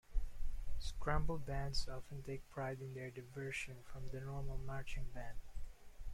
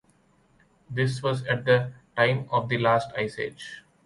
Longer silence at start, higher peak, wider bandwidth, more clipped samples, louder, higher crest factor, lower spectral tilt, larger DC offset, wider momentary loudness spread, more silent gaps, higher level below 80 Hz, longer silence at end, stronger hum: second, 0.1 s vs 0.9 s; second, -22 dBFS vs -6 dBFS; about the same, 12 kHz vs 11.5 kHz; neither; second, -46 LUFS vs -26 LUFS; about the same, 16 dB vs 20 dB; about the same, -5.5 dB/octave vs -6 dB/octave; neither; about the same, 12 LU vs 11 LU; neither; first, -46 dBFS vs -60 dBFS; second, 0 s vs 0.25 s; neither